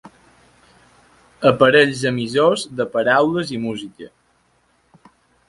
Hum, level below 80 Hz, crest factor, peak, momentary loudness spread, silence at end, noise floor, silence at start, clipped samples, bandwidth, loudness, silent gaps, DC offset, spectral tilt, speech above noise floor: none; -58 dBFS; 20 dB; 0 dBFS; 13 LU; 1.4 s; -61 dBFS; 0.05 s; under 0.1%; 11.5 kHz; -17 LUFS; none; under 0.1%; -5 dB/octave; 44 dB